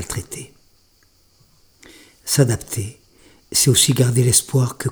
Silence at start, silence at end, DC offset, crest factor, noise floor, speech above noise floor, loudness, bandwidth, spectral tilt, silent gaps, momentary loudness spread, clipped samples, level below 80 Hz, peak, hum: 0 s; 0 s; under 0.1%; 20 dB; -57 dBFS; 39 dB; -17 LUFS; over 20 kHz; -4 dB/octave; none; 19 LU; under 0.1%; -48 dBFS; -2 dBFS; none